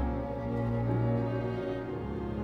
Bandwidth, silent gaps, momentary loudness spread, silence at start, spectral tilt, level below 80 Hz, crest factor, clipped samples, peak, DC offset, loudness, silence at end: 5 kHz; none; 6 LU; 0 s; -10 dB/octave; -42 dBFS; 14 dB; under 0.1%; -18 dBFS; under 0.1%; -33 LUFS; 0 s